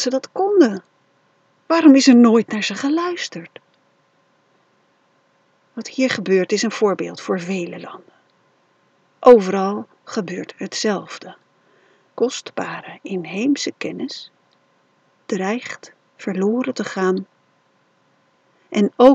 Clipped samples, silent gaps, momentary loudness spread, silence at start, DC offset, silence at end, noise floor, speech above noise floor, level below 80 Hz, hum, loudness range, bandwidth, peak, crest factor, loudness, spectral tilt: under 0.1%; none; 20 LU; 0 s; under 0.1%; 0 s; -61 dBFS; 43 dB; -66 dBFS; none; 10 LU; 8.2 kHz; 0 dBFS; 20 dB; -18 LUFS; -5 dB/octave